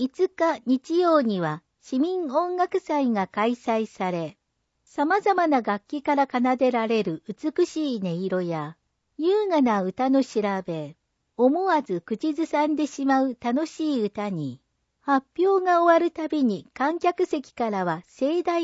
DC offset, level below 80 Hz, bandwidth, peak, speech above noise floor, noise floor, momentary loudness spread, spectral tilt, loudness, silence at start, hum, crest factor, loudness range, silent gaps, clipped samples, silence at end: under 0.1%; -70 dBFS; 8 kHz; -8 dBFS; 46 dB; -70 dBFS; 9 LU; -6.5 dB/octave; -24 LUFS; 0 s; none; 16 dB; 2 LU; none; under 0.1%; 0 s